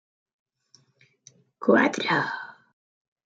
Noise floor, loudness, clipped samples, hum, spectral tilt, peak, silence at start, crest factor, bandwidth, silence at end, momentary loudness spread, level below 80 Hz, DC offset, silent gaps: -64 dBFS; -23 LUFS; under 0.1%; none; -5 dB/octave; -8 dBFS; 1.6 s; 22 dB; 8 kHz; 0.75 s; 16 LU; -74 dBFS; under 0.1%; none